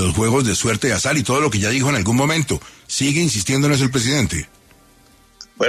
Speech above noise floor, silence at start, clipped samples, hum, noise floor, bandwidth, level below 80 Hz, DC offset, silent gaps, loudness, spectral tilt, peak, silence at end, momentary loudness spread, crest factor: 33 dB; 0 s; under 0.1%; none; -51 dBFS; 13.5 kHz; -40 dBFS; under 0.1%; none; -18 LUFS; -4 dB/octave; -4 dBFS; 0 s; 7 LU; 14 dB